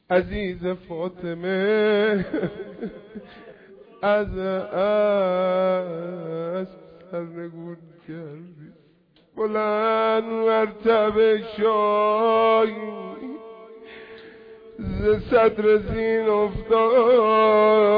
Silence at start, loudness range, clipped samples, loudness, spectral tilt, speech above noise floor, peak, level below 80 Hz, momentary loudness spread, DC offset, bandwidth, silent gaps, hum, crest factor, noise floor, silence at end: 0.1 s; 8 LU; under 0.1%; -21 LUFS; -9 dB/octave; 37 dB; -8 dBFS; -46 dBFS; 21 LU; under 0.1%; 5.2 kHz; none; none; 14 dB; -59 dBFS; 0 s